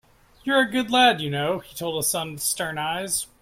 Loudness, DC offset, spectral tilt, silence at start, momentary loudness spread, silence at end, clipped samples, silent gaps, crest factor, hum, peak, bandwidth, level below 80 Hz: -23 LUFS; under 0.1%; -2.5 dB/octave; 0.45 s; 10 LU; 0.15 s; under 0.1%; none; 18 dB; none; -6 dBFS; 16.5 kHz; -58 dBFS